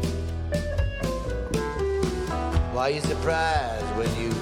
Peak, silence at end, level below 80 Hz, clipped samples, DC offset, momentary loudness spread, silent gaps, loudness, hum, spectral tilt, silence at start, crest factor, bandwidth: -10 dBFS; 0 s; -32 dBFS; under 0.1%; under 0.1%; 5 LU; none; -27 LUFS; none; -5.5 dB/octave; 0 s; 16 dB; 16 kHz